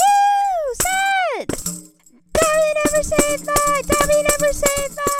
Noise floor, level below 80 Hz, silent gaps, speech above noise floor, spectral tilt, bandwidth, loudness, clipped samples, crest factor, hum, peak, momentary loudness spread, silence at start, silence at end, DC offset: -49 dBFS; -36 dBFS; none; 31 dB; -2.5 dB/octave; 17.5 kHz; -18 LUFS; under 0.1%; 16 dB; none; -2 dBFS; 8 LU; 0 s; 0 s; under 0.1%